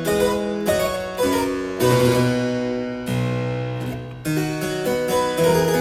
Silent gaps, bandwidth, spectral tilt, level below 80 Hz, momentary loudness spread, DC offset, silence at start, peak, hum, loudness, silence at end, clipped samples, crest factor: none; 16.5 kHz; -5.5 dB/octave; -46 dBFS; 8 LU; under 0.1%; 0 s; -4 dBFS; none; -21 LUFS; 0 s; under 0.1%; 16 dB